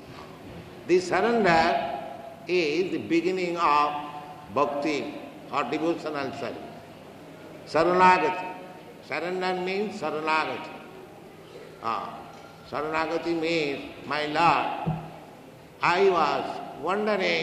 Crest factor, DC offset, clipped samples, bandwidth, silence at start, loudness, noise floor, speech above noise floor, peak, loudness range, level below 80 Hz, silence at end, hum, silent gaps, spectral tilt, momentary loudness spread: 20 dB; under 0.1%; under 0.1%; 14 kHz; 0 s; -26 LUFS; -47 dBFS; 22 dB; -6 dBFS; 6 LU; -60 dBFS; 0 s; none; none; -5 dB/octave; 23 LU